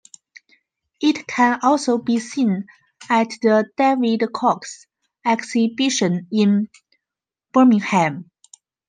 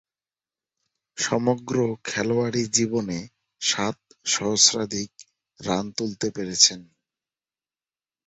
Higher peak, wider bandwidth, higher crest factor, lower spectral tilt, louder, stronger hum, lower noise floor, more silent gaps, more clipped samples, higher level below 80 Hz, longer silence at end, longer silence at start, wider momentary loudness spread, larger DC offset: about the same, -4 dBFS vs -2 dBFS; first, 9.6 kHz vs 8.4 kHz; second, 16 dB vs 24 dB; first, -5 dB/octave vs -2.5 dB/octave; first, -19 LUFS vs -23 LUFS; neither; about the same, -87 dBFS vs under -90 dBFS; neither; neither; second, -70 dBFS vs -62 dBFS; second, 0.65 s vs 1.45 s; second, 1 s vs 1.15 s; second, 8 LU vs 14 LU; neither